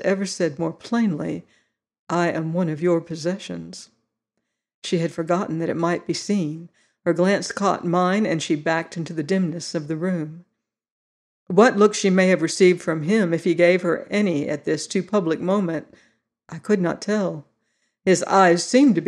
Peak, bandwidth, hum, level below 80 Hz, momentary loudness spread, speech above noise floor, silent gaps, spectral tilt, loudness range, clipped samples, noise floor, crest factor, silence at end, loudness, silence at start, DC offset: -4 dBFS; 11.5 kHz; none; -70 dBFS; 12 LU; 58 dB; 1.99-2.07 s, 4.74-4.82 s, 10.91-11.46 s; -5.5 dB/octave; 7 LU; under 0.1%; -79 dBFS; 18 dB; 0 s; -21 LUFS; 0 s; under 0.1%